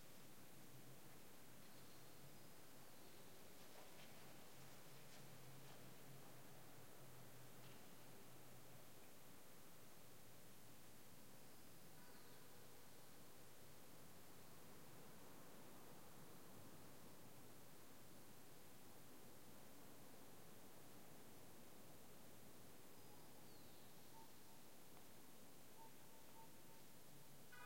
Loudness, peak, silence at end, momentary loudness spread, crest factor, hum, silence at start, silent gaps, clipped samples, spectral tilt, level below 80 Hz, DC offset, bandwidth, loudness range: -64 LUFS; -46 dBFS; 0 s; 2 LU; 16 dB; none; 0 s; none; under 0.1%; -3.5 dB/octave; -88 dBFS; 0.1%; 16.5 kHz; 2 LU